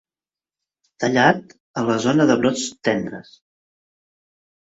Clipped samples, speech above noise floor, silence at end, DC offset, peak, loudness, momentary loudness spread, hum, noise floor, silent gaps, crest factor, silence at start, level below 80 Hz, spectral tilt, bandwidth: under 0.1%; over 71 dB; 1.5 s; under 0.1%; -2 dBFS; -19 LUFS; 13 LU; none; under -90 dBFS; 1.60-1.74 s; 20 dB; 1 s; -60 dBFS; -5 dB/octave; 8 kHz